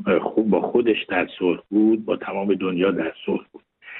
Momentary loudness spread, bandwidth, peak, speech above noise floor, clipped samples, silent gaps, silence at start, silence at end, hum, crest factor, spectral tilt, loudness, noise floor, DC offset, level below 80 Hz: 7 LU; 4 kHz; -6 dBFS; 21 dB; under 0.1%; none; 0 s; 0 s; none; 16 dB; -11 dB/octave; -22 LUFS; -42 dBFS; under 0.1%; -60 dBFS